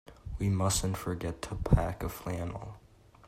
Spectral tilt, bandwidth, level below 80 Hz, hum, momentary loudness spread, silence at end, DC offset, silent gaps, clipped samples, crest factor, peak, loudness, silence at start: -5.5 dB/octave; 16 kHz; -40 dBFS; none; 13 LU; 0.5 s; under 0.1%; none; under 0.1%; 22 dB; -10 dBFS; -32 LUFS; 0.1 s